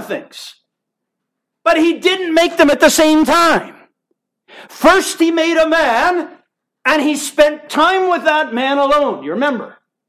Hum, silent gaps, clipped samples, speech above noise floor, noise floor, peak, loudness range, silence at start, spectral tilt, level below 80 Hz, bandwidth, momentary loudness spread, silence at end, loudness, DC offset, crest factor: none; none; under 0.1%; 64 dB; -77 dBFS; 0 dBFS; 2 LU; 0 s; -2.5 dB/octave; -48 dBFS; 15.5 kHz; 9 LU; 0.4 s; -13 LUFS; under 0.1%; 14 dB